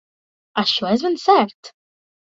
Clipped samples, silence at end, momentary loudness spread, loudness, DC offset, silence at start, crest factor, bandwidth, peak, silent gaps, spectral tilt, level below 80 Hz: under 0.1%; 0.65 s; 9 LU; -18 LUFS; under 0.1%; 0.55 s; 20 dB; 7.8 kHz; -2 dBFS; 1.55-1.63 s; -4.5 dB/octave; -64 dBFS